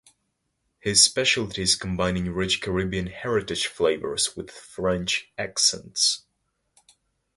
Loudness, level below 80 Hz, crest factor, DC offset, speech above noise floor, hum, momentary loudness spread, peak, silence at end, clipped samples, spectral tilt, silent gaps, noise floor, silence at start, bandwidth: -23 LUFS; -48 dBFS; 24 dB; under 0.1%; 51 dB; none; 12 LU; -2 dBFS; 1.2 s; under 0.1%; -2.5 dB/octave; none; -76 dBFS; 0.85 s; 11.5 kHz